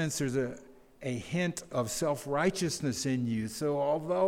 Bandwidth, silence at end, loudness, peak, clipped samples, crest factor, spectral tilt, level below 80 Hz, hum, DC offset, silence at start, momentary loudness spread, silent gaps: 17 kHz; 0 s; -32 LUFS; -16 dBFS; under 0.1%; 16 dB; -5 dB/octave; -60 dBFS; none; under 0.1%; 0 s; 8 LU; none